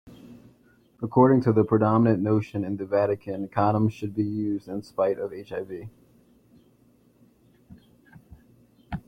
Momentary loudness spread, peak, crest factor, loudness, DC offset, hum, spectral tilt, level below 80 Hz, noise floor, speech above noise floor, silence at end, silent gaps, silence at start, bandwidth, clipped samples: 15 LU; -6 dBFS; 20 dB; -24 LUFS; under 0.1%; none; -10 dB/octave; -58 dBFS; -60 dBFS; 37 dB; 0.1 s; none; 0.05 s; 7.6 kHz; under 0.1%